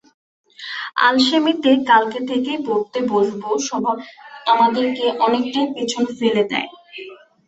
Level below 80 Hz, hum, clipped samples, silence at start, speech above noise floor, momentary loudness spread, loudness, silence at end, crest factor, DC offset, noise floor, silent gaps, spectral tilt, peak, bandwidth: -64 dBFS; none; under 0.1%; 0.6 s; 20 dB; 15 LU; -18 LUFS; 0.3 s; 18 dB; under 0.1%; -38 dBFS; none; -3.5 dB/octave; -2 dBFS; 8.2 kHz